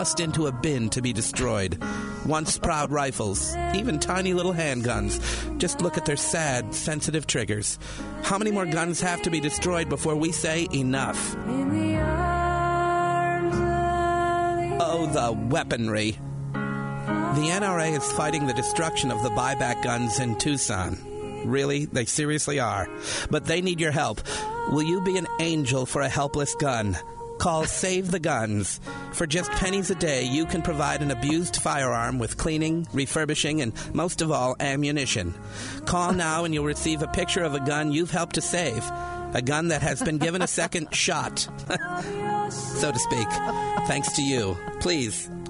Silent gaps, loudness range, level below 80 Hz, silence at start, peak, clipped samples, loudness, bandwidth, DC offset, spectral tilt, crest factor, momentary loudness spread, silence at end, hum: none; 1 LU; -42 dBFS; 0 s; -10 dBFS; under 0.1%; -26 LUFS; 11 kHz; under 0.1%; -4 dB/octave; 16 dB; 5 LU; 0 s; none